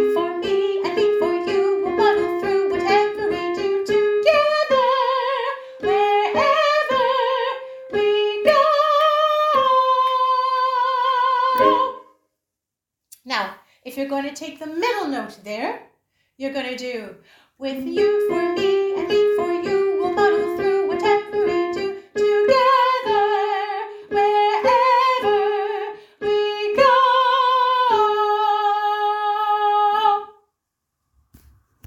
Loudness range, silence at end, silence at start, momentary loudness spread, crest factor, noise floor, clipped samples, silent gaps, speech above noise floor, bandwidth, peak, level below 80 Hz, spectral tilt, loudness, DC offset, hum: 9 LU; 1.55 s; 0 s; 11 LU; 16 dB; -84 dBFS; under 0.1%; none; 62 dB; 16.5 kHz; -4 dBFS; -60 dBFS; -4 dB/octave; -19 LUFS; under 0.1%; none